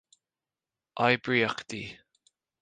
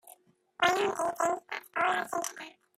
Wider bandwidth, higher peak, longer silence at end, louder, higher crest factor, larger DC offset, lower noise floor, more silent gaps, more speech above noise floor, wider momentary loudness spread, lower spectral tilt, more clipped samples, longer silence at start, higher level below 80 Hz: second, 9.6 kHz vs 16 kHz; about the same, -8 dBFS vs -10 dBFS; first, 0.7 s vs 0.3 s; about the same, -28 LUFS vs -30 LUFS; about the same, 24 dB vs 22 dB; neither; first, under -90 dBFS vs -59 dBFS; neither; first, over 62 dB vs 28 dB; first, 18 LU vs 10 LU; first, -5 dB/octave vs -2 dB/octave; neither; first, 0.95 s vs 0.05 s; first, -68 dBFS vs -74 dBFS